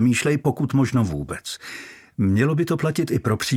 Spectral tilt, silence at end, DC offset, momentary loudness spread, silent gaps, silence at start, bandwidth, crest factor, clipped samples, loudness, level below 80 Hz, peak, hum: -6 dB/octave; 0 s; under 0.1%; 13 LU; none; 0 s; 16.5 kHz; 14 dB; under 0.1%; -22 LUFS; -48 dBFS; -6 dBFS; none